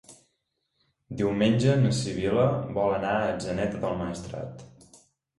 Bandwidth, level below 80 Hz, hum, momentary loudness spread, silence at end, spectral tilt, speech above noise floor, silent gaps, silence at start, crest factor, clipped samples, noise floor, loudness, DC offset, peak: 11.5 kHz; -52 dBFS; none; 15 LU; 0.75 s; -6.5 dB/octave; 52 dB; none; 0.1 s; 18 dB; under 0.1%; -77 dBFS; -26 LUFS; under 0.1%; -10 dBFS